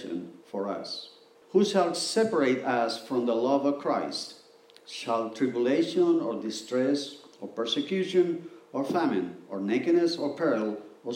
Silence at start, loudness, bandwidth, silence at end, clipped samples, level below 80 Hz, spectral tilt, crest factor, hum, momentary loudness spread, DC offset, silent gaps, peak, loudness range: 0 s; -28 LUFS; 15.5 kHz; 0 s; under 0.1%; -84 dBFS; -5 dB/octave; 18 dB; none; 13 LU; under 0.1%; none; -10 dBFS; 2 LU